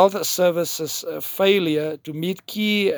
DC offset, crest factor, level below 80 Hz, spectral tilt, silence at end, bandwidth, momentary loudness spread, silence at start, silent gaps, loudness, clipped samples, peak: under 0.1%; 20 dB; -70 dBFS; -4 dB/octave; 0 s; over 20 kHz; 9 LU; 0 s; none; -22 LUFS; under 0.1%; -2 dBFS